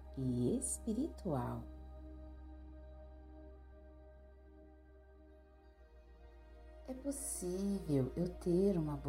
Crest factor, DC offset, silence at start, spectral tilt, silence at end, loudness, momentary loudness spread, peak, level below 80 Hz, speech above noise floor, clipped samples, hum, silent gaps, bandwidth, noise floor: 18 dB; under 0.1%; 0 s; -6.5 dB/octave; 0 s; -38 LUFS; 25 LU; -24 dBFS; -54 dBFS; 24 dB; under 0.1%; none; none; 16 kHz; -62 dBFS